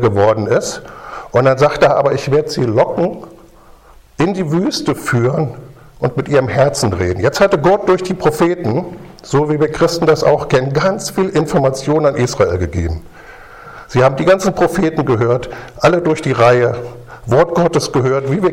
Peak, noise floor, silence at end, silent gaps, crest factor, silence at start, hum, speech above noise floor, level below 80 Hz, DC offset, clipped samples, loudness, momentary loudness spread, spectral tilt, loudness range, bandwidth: 0 dBFS; -42 dBFS; 0 s; none; 14 dB; 0 s; none; 28 dB; -38 dBFS; under 0.1%; under 0.1%; -14 LUFS; 10 LU; -6 dB/octave; 3 LU; 16.5 kHz